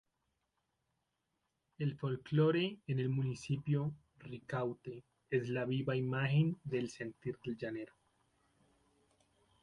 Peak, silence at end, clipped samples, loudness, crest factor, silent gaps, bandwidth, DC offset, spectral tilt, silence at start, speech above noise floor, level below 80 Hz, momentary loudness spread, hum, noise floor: -22 dBFS; 1.75 s; under 0.1%; -37 LUFS; 18 dB; none; 10.5 kHz; under 0.1%; -7.5 dB/octave; 1.8 s; 48 dB; -72 dBFS; 16 LU; none; -85 dBFS